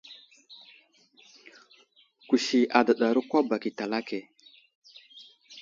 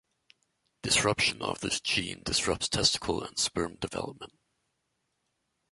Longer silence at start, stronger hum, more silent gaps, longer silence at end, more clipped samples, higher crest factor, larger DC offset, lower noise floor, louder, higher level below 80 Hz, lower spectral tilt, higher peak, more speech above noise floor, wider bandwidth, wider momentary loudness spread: second, 0.1 s vs 0.85 s; neither; first, 4.75-4.82 s vs none; second, 0 s vs 1.45 s; neither; about the same, 24 dB vs 22 dB; neither; second, -61 dBFS vs -79 dBFS; about the same, -26 LUFS vs -28 LUFS; second, -78 dBFS vs -54 dBFS; first, -4 dB/octave vs -2 dB/octave; first, -4 dBFS vs -10 dBFS; second, 36 dB vs 49 dB; second, 7.6 kHz vs 12 kHz; first, 27 LU vs 13 LU